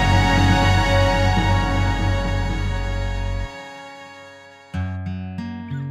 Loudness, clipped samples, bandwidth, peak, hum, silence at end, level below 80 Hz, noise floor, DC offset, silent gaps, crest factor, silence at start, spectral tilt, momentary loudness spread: -21 LUFS; under 0.1%; 11.5 kHz; -4 dBFS; none; 0 s; -26 dBFS; -43 dBFS; under 0.1%; none; 16 dB; 0 s; -6 dB/octave; 20 LU